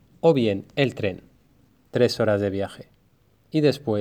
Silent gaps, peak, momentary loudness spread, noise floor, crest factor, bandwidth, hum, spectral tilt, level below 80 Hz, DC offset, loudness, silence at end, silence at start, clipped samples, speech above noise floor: none; -6 dBFS; 10 LU; -62 dBFS; 18 dB; 15 kHz; none; -6.5 dB/octave; -62 dBFS; under 0.1%; -23 LUFS; 0 s; 0.25 s; under 0.1%; 39 dB